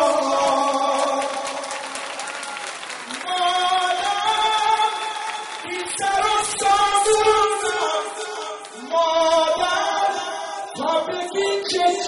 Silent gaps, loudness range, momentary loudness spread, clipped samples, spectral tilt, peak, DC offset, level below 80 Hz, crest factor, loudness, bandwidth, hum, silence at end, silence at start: none; 4 LU; 12 LU; under 0.1%; -1 dB/octave; -4 dBFS; under 0.1%; -56 dBFS; 16 dB; -21 LUFS; 11.5 kHz; none; 0 s; 0 s